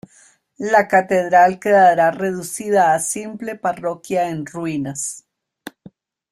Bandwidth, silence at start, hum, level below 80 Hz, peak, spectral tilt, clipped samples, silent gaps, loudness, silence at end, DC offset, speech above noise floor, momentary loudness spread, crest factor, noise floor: 14.5 kHz; 0.6 s; none; -62 dBFS; -2 dBFS; -4.5 dB/octave; under 0.1%; none; -17 LUFS; 0.65 s; under 0.1%; 36 dB; 14 LU; 18 dB; -53 dBFS